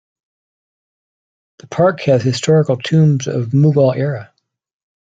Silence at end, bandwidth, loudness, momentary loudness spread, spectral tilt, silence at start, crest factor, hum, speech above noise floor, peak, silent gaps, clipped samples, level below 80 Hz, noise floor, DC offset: 0.95 s; 7.8 kHz; -14 LUFS; 8 LU; -7 dB/octave; 1.7 s; 16 dB; none; over 76 dB; -2 dBFS; none; under 0.1%; -56 dBFS; under -90 dBFS; under 0.1%